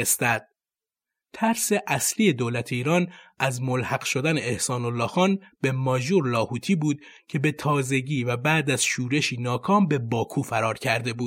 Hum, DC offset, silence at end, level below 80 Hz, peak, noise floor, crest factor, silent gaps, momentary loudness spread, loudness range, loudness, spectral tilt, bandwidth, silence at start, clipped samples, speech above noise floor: none; under 0.1%; 0 s; -62 dBFS; -6 dBFS; under -90 dBFS; 18 dB; none; 6 LU; 1 LU; -24 LUFS; -4.5 dB/octave; 16.5 kHz; 0 s; under 0.1%; over 66 dB